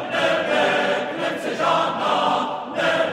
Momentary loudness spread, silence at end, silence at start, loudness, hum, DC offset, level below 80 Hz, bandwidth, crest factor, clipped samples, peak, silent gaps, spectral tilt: 6 LU; 0 s; 0 s; -21 LUFS; none; under 0.1%; -68 dBFS; 15.5 kHz; 14 dB; under 0.1%; -6 dBFS; none; -4 dB/octave